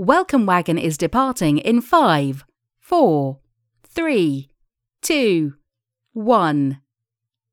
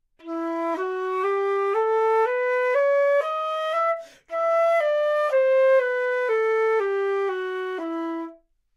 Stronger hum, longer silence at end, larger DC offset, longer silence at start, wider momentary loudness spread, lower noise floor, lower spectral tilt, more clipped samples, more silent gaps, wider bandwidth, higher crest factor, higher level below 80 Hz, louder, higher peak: neither; first, 0.75 s vs 0.4 s; neither; second, 0 s vs 0.25 s; first, 13 LU vs 9 LU; first, -83 dBFS vs -47 dBFS; first, -5.5 dB/octave vs -2.5 dB/octave; neither; neither; first, 18 kHz vs 12 kHz; first, 20 dB vs 12 dB; first, -52 dBFS vs -72 dBFS; first, -18 LUFS vs -23 LUFS; first, 0 dBFS vs -12 dBFS